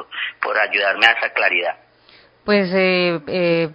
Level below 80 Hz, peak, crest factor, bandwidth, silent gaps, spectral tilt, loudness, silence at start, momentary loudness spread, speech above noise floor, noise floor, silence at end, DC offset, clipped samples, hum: -62 dBFS; 0 dBFS; 18 dB; 8 kHz; none; -6 dB/octave; -17 LUFS; 0 s; 13 LU; 33 dB; -51 dBFS; 0 s; under 0.1%; under 0.1%; none